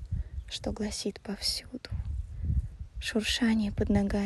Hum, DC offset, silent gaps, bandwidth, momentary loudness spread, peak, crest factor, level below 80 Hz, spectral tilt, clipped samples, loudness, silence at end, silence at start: none; under 0.1%; none; 12.5 kHz; 11 LU; -14 dBFS; 16 dB; -38 dBFS; -5 dB/octave; under 0.1%; -32 LUFS; 0 s; 0 s